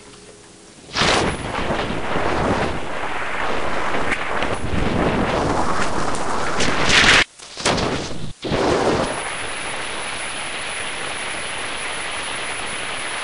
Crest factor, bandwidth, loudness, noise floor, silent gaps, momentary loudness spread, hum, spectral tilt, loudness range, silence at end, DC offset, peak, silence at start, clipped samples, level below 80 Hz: 18 dB; 11 kHz; -21 LUFS; -44 dBFS; none; 9 LU; none; -3.5 dB/octave; 7 LU; 0 s; 2%; -2 dBFS; 0 s; under 0.1%; -36 dBFS